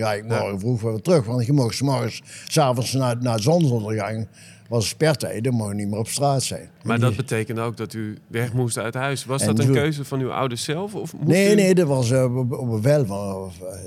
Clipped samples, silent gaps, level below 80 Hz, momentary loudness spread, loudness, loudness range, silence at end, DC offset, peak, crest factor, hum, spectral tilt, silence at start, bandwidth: under 0.1%; none; -64 dBFS; 10 LU; -22 LUFS; 4 LU; 0 s; under 0.1%; -6 dBFS; 16 dB; none; -5.5 dB/octave; 0 s; 15.5 kHz